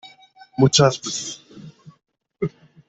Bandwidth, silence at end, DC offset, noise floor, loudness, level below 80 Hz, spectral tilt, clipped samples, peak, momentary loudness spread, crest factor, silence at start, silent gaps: 8.4 kHz; 0.4 s; under 0.1%; -49 dBFS; -20 LUFS; -58 dBFS; -4.5 dB/octave; under 0.1%; -2 dBFS; 19 LU; 20 dB; 0.05 s; none